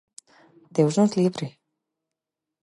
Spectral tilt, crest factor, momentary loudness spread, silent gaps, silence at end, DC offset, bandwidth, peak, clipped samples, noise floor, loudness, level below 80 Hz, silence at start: -7 dB/octave; 20 dB; 15 LU; none; 1.15 s; under 0.1%; 11.5 kHz; -8 dBFS; under 0.1%; -86 dBFS; -23 LUFS; -74 dBFS; 0.75 s